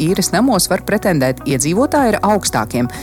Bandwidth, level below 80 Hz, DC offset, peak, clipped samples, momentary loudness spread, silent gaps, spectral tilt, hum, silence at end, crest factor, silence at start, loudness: 17.5 kHz; -38 dBFS; under 0.1%; -2 dBFS; under 0.1%; 4 LU; none; -4.5 dB/octave; none; 0 s; 14 dB; 0 s; -15 LUFS